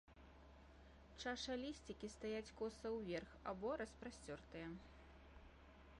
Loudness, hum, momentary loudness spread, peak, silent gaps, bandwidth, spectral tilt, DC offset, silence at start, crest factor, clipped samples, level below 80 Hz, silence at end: -50 LUFS; none; 19 LU; -34 dBFS; none; 11 kHz; -4.5 dB/octave; under 0.1%; 0.05 s; 18 dB; under 0.1%; -66 dBFS; 0 s